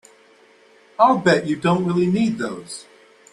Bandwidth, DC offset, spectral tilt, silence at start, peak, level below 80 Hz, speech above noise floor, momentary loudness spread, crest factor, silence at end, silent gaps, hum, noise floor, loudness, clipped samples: 11.5 kHz; under 0.1%; -6 dB/octave; 1 s; -2 dBFS; -60 dBFS; 34 dB; 19 LU; 20 dB; 0.5 s; none; none; -52 dBFS; -19 LUFS; under 0.1%